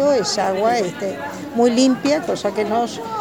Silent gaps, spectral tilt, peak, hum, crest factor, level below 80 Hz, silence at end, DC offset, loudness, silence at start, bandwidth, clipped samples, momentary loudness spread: none; -4 dB/octave; -4 dBFS; none; 14 dB; -58 dBFS; 0 s; 0.1%; -19 LUFS; 0 s; 18 kHz; under 0.1%; 10 LU